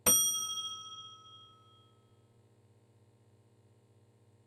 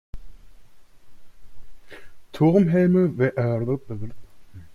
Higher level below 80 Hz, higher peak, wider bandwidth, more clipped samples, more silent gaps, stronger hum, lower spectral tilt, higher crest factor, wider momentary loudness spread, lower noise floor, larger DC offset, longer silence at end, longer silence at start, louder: second, -70 dBFS vs -50 dBFS; second, -14 dBFS vs -6 dBFS; first, 13.5 kHz vs 6.8 kHz; neither; neither; neither; second, 0 dB/octave vs -9.5 dB/octave; first, 26 dB vs 18 dB; first, 28 LU vs 18 LU; first, -65 dBFS vs -43 dBFS; neither; first, 3 s vs 0 s; about the same, 0.05 s vs 0.15 s; second, -31 LUFS vs -21 LUFS